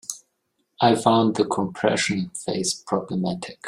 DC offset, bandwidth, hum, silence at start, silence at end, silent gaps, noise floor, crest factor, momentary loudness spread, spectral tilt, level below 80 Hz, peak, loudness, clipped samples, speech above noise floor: under 0.1%; 15.5 kHz; none; 0.1 s; 0 s; none; -73 dBFS; 22 dB; 9 LU; -4.5 dB/octave; -62 dBFS; -2 dBFS; -22 LUFS; under 0.1%; 51 dB